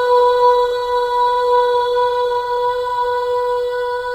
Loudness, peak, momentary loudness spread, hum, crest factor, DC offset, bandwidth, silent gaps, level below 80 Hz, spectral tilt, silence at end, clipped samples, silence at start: -16 LUFS; -4 dBFS; 6 LU; none; 12 dB; under 0.1%; 12.5 kHz; none; -48 dBFS; -2 dB/octave; 0 s; under 0.1%; 0 s